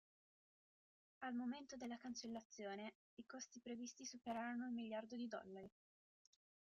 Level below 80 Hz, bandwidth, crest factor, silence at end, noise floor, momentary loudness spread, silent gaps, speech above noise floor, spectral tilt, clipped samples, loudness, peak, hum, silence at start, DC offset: -88 dBFS; 7.4 kHz; 16 dB; 1.05 s; under -90 dBFS; 10 LU; 2.45-2.50 s, 2.95-3.17 s; over 39 dB; -3 dB/octave; under 0.1%; -51 LUFS; -36 dBFS; none; 1.2 s; under 0.1%